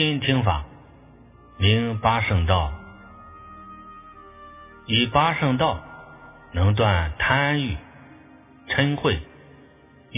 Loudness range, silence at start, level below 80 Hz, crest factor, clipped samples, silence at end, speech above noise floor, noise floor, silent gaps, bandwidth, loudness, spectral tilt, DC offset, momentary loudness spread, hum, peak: 3 LU; 0 s; -36 dBFS; 20 dB; under 0.1%; 0 s; 30 dB; -51 dBFS; none; 3.9 kHz; -22 LUFS; -10 dB/octave; under 0.1%; 23 LU; none; -4 dBFS